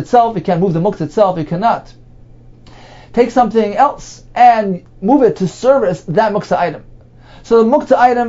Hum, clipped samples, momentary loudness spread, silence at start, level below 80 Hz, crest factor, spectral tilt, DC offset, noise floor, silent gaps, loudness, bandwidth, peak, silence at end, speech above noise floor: none; under 0.1%; 10 LU; 0 s; -42 dBFS; 14 dB; -7 dB/octave; under 0.1%; -39 dBFS; none; -13 LUFS; 7.8 kHz; 0 dBFS; 0 s; 27 dB